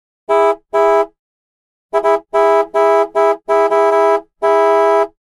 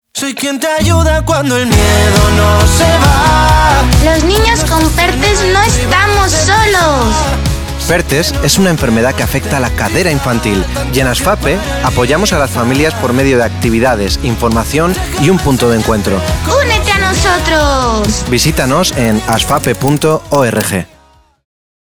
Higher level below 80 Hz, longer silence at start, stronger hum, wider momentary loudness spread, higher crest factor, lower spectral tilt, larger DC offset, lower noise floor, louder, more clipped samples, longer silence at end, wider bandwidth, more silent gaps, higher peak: second, -54 dBFS vs -20 dBFS; first, 0.3 s vs 0.15 s; neither; about the same, 5 LU vs 6 LU; about the same, 12 dB vs 10 dB; about the same, -3.5 dB/octave vs -4.5 dB/octave; neither; first, under -90 dBFS vs -46 dBFS; second, -14 LUFS vs -10 LUFS; neither; second, 0.15 s vs 1.15 s; second, 11.5 kHz vs over 20 kHz; first, 1.19-1.89 s vs none; about the same, -2 dBFS vs 0 dBFS